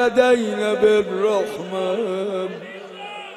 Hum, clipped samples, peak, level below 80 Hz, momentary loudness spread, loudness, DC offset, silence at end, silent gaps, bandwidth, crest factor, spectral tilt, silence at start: none; under 0.1%; -4 dBFS; -60 dBFS; 17 LU; -20 LUFS; under 0.1%; 0 s; none; 13 kHz; 16 dB; -5 dB/octave; 0 s